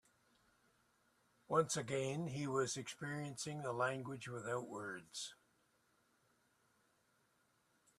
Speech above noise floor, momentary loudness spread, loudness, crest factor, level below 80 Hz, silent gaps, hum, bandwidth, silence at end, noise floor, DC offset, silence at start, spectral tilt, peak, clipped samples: 36 dB; 10 LU; -42 LUFS; 24 dB; -82 dBFS; none; none; 14 kHz; 2.65 s; -78 dBFS; under 0.1%; 1.5 s; -4.5 dB/octave; -20 dBFS; under 0.1%